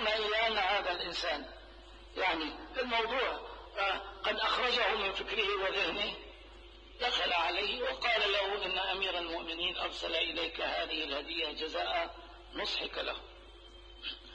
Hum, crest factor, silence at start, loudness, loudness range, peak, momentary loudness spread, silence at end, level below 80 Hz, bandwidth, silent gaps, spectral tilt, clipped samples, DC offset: none; 18 dB; 0 s; -33 LUFS; 3 LU; -16 dBFS; 15 LU; 0 s; -56 dBFS; 9.6 kHz; none; -2.5 dB/octave; under 0.1%; under 0.1%